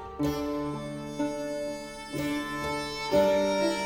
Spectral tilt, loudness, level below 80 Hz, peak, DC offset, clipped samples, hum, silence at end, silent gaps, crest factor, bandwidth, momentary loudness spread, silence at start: -5 dB/octave; -30 LUFS; -52 dBFS; -12 dBFS; under 0.1%; under 0.1%; none; 0 s; none; 16 dB; 18.5 kHz; 12 LU; 0 s